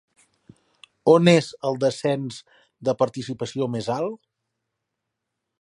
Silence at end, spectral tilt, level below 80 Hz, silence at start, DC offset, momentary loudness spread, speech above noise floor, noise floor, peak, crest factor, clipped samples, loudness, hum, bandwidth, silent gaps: 1.45 s; -6 dB/octave; -68 dBFS; 1.05 s; under 0.1%; 15 LU; 60 dB; -82 dBFS; -2 dBFS; 24 dB; under 0.1%; -22 LUFS; none; 11.5 kHz; none